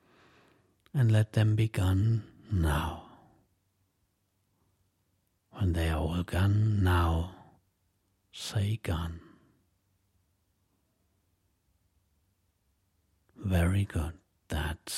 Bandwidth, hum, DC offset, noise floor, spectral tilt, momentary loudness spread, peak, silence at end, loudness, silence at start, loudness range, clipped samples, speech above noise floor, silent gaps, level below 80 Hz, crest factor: 14 kHz; none; under 0.1%; -76 dBFS; -6.5 dB/octave; 14 LU; -12 dBFS; 0 s; -30 LUFS; 0.95 s; 9 LU; under 0.1%; 48 dB; none; -48 dBFS; 20 dB